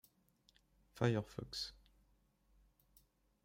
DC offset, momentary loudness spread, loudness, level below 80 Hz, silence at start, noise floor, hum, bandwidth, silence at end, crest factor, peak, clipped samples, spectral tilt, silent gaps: under 0.1%; 9 LU; -41 LUFS; -68 dBFS; 0.95 s; -75 dBFS; none; 16 kHz; 1.7 s; 26 dB; -20 dBFS; under 0.1%; -6 dB/octave; none